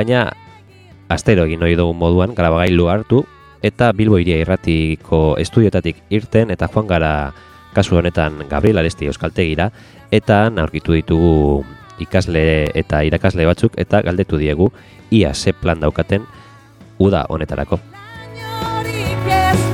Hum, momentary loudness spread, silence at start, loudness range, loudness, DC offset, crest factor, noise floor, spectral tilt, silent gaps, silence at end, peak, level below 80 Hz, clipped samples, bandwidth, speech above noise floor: none; 8 LU; 0 s; 3 LU; -16 LUFS; under 0.1%; 16 dB; -43 dBFS; -7 dB/octave; none; 0 s; 0 dBFS; -30 dBFS; under 0.1%; 15.5 kHz; 28 dB